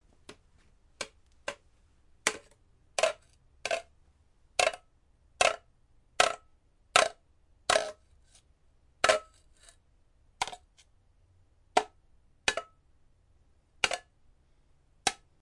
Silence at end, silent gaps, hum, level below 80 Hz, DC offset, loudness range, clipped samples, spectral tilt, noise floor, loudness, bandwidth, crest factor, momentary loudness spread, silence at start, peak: 0.25 s; none; none; -64 dBFS; under 0.1%; 7 LU; under 0.1%; 0 dB/octave; -65 dBFS; -31 LUFS; 11.5 kHz; 32 dB; 16 LU; 0.3 s; -4 dBFS